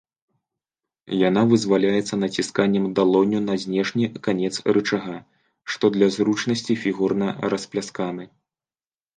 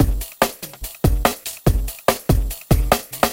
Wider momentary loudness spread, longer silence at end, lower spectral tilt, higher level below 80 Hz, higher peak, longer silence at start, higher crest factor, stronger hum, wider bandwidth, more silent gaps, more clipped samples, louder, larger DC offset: first, 10 LU vs 4 LU; first, 0.9 s vs 0 s; about the same, -5.5 dB/octave vs -5 dB/octave; second, -62 dBFS vs -24 dBFS; second, -4 dBFS vs 0 dBFS; first, 1.05 s vs 0 s; about the same, 20 dB vs 20 dB; neither; second, 9.8 kHz vs 17 kHz; neither; neither; about the same, -22 LUFS vs -21 LUFS; neither